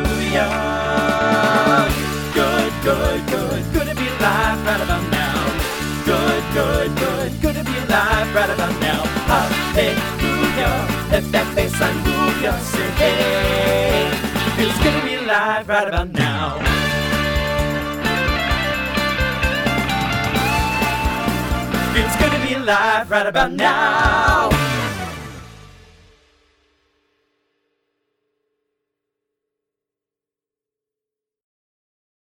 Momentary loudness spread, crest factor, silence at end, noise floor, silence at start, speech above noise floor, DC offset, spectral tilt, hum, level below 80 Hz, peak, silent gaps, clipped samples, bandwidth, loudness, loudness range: 5 LU; 18 dB; 6.65 s; -88 dBFS; 0 s; 71 dB; under 0.1%; -4.5 dB/octave; none; -30 dBFS; 0 dBFS; none; under 0.1%; 19.5 kHz; -18 LUFS; 2 LU